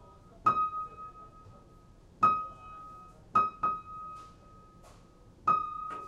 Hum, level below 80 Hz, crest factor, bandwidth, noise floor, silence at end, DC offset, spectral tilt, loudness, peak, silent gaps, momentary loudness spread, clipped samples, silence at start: none; -60 dBFS; 20 dB; 9.6 kHz; -56 dBFS; 0 s; under 0.1%; -6 dB/octave; -31 LUFS; -14 dBFS; none; 22 LU; under 0.1%; 0 s